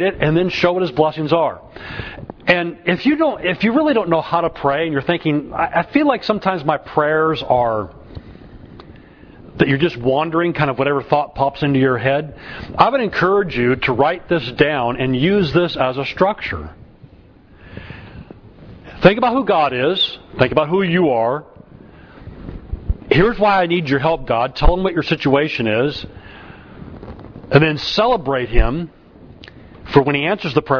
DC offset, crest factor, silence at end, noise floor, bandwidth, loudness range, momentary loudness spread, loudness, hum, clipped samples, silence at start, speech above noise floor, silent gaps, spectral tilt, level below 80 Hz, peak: under 0.1%; 18 dB; 0 s; -45 dBFS; 5.4 kHz; 4 LU; 17 LU; -17 LUFS; none; under 0.1%; 0 s; 29 dB; none; -7.5 dB/octave; -32 dBFS; 0 dBFS